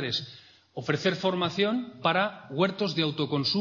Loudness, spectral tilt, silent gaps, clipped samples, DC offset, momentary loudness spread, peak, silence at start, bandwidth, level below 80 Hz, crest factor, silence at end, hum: -28 LUFS; -5.5 dB/octave; none; under 0.1%; under 0.1%; 6 LU; -10 dBFS; 0 s; 7.4 kHz; -70 dBFS; 18 dB; 0 s; none